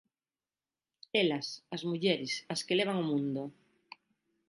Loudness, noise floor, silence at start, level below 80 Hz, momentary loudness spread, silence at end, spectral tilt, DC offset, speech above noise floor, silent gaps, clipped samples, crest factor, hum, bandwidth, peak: -33 LUFS; under -90 dBFS; 1.15 s; -80 dBFS; 9 LU; 0.95 s; -4.5 dB/octave; under 0.1%; over 57 dB; none; under 0.1%; 22 dB; none; 11.5 kHz; -14 dBFS